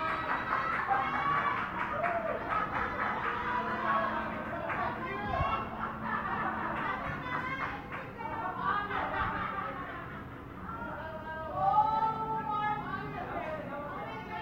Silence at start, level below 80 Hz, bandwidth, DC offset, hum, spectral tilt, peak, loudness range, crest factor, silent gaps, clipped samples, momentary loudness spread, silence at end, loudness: 0 s; -54 dBFS; 16.5 kHz; under 0.1%; none; -6.5 dB/octave; -16 dBFS; 4 LU; 18 dB; none; under 0.1%; 10 LU; 0 s; -33 LUFS